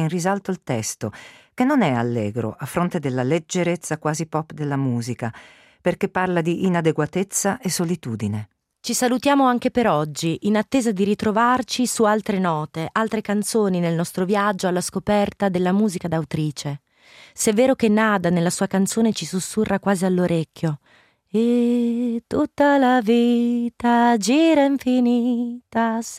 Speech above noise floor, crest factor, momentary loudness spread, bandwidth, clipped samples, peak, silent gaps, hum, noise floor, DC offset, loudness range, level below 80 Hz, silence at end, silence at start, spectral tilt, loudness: 29 dB; 14 dB; 9 LU; 16 kHz; under 0.1%; -6 dBFS; none; none; -49 dBFS; under 0.1%; 5 LU; -58 dBFS; 0 s; 0 s; -5.5 dB/octave; -21 LUFS